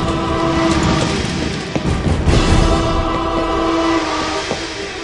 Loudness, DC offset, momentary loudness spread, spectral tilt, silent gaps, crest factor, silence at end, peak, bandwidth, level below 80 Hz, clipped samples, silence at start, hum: -17 LUFS; 0.2%; 6 LU; -5.5 dB/octave; none; 16 dB; 0 s; 0 dBFS; 11.5 kHz; -24 dBFS; under 0.1%; 0 s; none